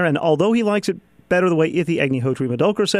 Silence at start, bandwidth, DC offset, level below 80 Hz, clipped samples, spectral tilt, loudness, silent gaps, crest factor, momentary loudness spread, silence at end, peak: 0 s; 14 kHz; under 0.1%; -58 dBFS; under 0.1%; -6 dB/octave; -19 LUFS; none; 16 dB; 5 LU; 0 s; -2 dBFS